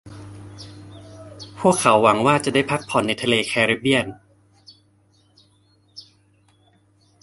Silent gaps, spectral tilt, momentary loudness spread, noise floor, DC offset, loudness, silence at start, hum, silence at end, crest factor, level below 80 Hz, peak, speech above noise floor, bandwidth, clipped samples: none; -4 dB/octave; 25 LU; -59 dBFS; under 0.1%; -19 LUFS; 0.05 s; none; 1.25 s; 22 dB; -56 dBFS; -2 dBFS; 40 dB; 11.5 kHz; under 0.1%